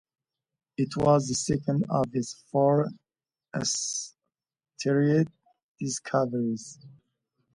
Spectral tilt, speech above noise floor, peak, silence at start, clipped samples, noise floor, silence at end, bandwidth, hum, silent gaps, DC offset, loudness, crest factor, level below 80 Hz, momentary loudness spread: -5.5 dB/octave; over 64 dB; -10 dBFS; 0.8 s; under 0.1%; under -90 dBFS; 0.65 s; 11.5 kHz; none; 5.63-5.75 s; under 0.1%; -27 LUFS; 18 dB; -60 dBFS; 13 LU